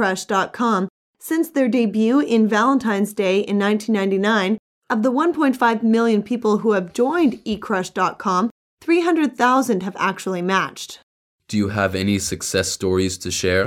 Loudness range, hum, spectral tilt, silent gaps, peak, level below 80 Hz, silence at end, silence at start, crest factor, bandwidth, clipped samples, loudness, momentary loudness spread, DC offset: 3 LU; none; -5 dB/octave; 0.90-1.14 s, 4.59-4.82 s, 8.51-8.77 s, 11.03-11.39 s; -4 dBFS; -54 dBFS; 0 s; 0 s; 16 dB; 16 kHz; under 0.1%; -19 LUFS; 7 LU; under 0.1%